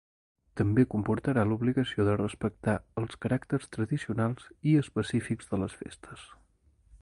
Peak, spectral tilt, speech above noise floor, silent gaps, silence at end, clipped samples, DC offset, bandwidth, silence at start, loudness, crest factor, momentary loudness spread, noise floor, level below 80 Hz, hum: -12 dBFS; -7.5 dB/octave; 36 dB; none; 0.05 s; under 0.1%; under 0.1%; 11.5 kHz; 0.55 s; -30 LUFS; 20 dB; 12 LU; -65 dBFS; -54 dBFS; none